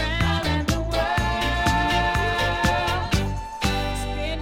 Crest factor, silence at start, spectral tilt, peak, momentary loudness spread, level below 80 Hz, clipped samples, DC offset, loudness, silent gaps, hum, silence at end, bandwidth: 16 dB; 0 s; -4.5 dB/octave; -8 dBFS; 5 LU; -30 dBFS; under 0.1%; under 0.1%; -23 LUFS; none; none; 0 s; 16.5 kHz